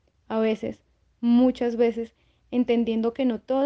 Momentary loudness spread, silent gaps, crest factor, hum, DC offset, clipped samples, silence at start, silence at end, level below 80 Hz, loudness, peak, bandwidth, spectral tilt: 11 LU; none; 14 dB; none; under 0.1%; under 0.1%; 0.3 s; 0 s; -60 dBFS; -24 LUFS; -10 dBFS; 6.4 kHz; -7.5 dB/octave